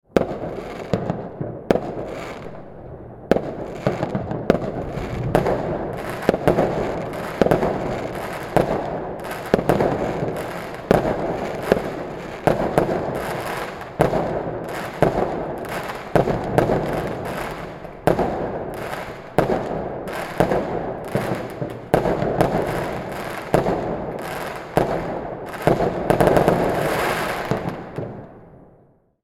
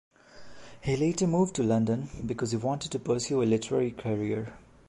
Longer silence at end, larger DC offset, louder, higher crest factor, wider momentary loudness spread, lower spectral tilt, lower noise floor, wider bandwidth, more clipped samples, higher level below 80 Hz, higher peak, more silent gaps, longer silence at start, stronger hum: first, 0.6 s vs 0.3 s; neither; first, -23 LUFS vs -29 LUFS; first, 22 dB vs 16 dB; first, 11 LU vs 7 LU; about the same, -6.5 dB/octave vs -6 dB/octave; first, -55 dBFS vs -48 dBFS; first, 18 kHz vs 11.5 kHz; neither; first, -40 dBFS vs -54 dBFS; first, 0 dBFS vs -14 dBFS; neither; second, 0.15 s vs 0.35 s; neither